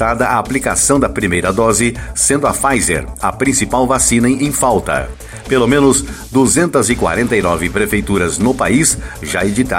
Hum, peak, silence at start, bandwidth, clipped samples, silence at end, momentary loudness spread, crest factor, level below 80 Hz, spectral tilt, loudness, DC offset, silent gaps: none; 0 dBFS; 0 s; 16.5 kHz; under 0.1%; 0 s; 6 LU; 14 dB; -30 dBFS; -4 dB/octave; -13 LUFS; under 0.1%; none